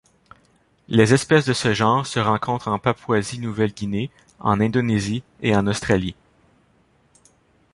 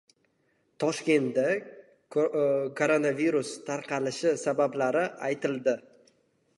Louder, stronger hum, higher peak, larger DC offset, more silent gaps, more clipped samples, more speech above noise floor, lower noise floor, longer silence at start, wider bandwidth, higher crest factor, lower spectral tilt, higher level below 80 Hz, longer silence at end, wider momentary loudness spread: first, -21 LUFS vs -28 LUFS; neither; first, -2 dBFS vs -10 dBFS; neither; neither; neither; second, 40 dB vs 44 dB; second, -60 dBFS vs -71 dBFS; about the same, 0.9 s vs 0.8 s; about the same, 11.5 kHz vs 11.5 kHz; about the same, 20 dB vs 20 dB; about the same, -5.5 dB/octave vs -5 dB/octave; first, -48 dBFS vs -82 dBFS; first, 1.6 s vs 0.8 s; first, 10 LU vs 7 LU